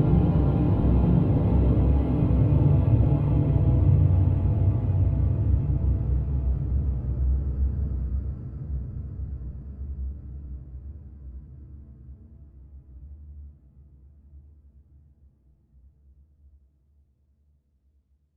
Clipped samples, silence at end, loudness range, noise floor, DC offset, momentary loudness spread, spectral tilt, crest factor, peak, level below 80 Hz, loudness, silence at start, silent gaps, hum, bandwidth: under 0.1%; 3.95 s; 21 LU; -66 dBFS; under 0.1%; 23 LU; -12.5 dB/octave; 16 dB; -10 dBFS; -30 dBFS; -24 LUFS; 0 s; none; none; 3.3 kHz